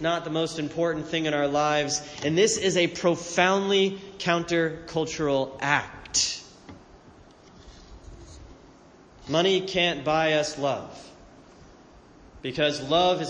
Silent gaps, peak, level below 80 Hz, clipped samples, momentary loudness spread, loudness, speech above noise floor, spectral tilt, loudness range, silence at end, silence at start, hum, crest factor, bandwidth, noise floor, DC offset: none; -4 dBFS; -54 dBFS; under 0.1%; 8 LU; -25 LUFS; 27 dB; -3.5 dB/octave; 7 LU; 0 s; 0 s; none; 22 dB; 10 kHz; -52 dBFS; under 0.1%